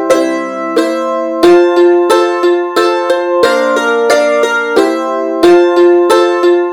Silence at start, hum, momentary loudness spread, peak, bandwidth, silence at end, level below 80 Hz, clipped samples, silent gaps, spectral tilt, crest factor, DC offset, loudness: 0 s; none; 7 LU; 0 dBFS; 14.5 kHz; 0 s; -52 dBFS; 0.4%; none; -3.5 dB/octave; 10 dB; under 0.1%; -10 LUFS